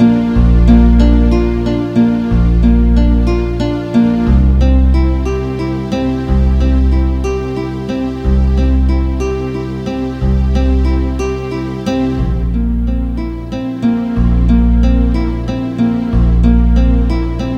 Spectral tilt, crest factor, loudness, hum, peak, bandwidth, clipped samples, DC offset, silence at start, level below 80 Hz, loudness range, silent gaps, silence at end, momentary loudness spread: -8.5 dB/octave; 12 dB; -13 LUFS; none; 0 dBFS; 6.6 kHz; under 0.1%; under 0.1%; 0 s; -14 dBFS; 4 LU; none; 0 s; 8 LU